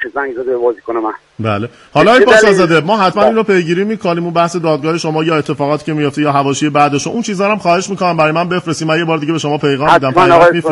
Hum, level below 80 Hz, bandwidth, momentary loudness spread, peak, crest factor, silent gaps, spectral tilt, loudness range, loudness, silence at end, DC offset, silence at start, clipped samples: none; -48 dBFS; 11.5 kHz; 11 LU; 0 dBFS; 12 dB; none; -5.5 dB/octave; 3 LU; -12 LUFS; 0 s; under 0.1%; 0 s; 0.2%